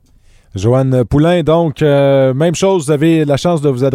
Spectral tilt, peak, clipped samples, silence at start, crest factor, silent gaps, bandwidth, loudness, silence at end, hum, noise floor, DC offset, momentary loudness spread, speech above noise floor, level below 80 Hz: -7 dB/octave; -2 dBFS; under 0.1%; 0.55 s; 10 dB; none; 15 kHz; -12 LUFS; 0 s; none; -46 dBFS; under 0.1%; 3 LU; 35 dB; -38 dBFS